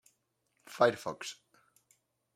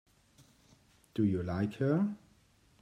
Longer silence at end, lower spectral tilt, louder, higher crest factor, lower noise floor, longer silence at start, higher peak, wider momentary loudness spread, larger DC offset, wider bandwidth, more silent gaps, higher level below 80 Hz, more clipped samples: first, 1 s vs 0.65 s; second, -4 dB/octave vs -9 dB/octave; about the same, -32 LUFS vs -33 LUFS; first, 26 dB vs 18 dB; first, -79 dBFS vs -66 dBFS; second, 0.7 s vs 1.15 s; first, -12 dBFS vs -18 dBFS; first, 22 LU vs 10 LU; neither; first, 16 kHz vs 9.8 kHz; neither; second, -80 dBFS vs -66 dBFS; neither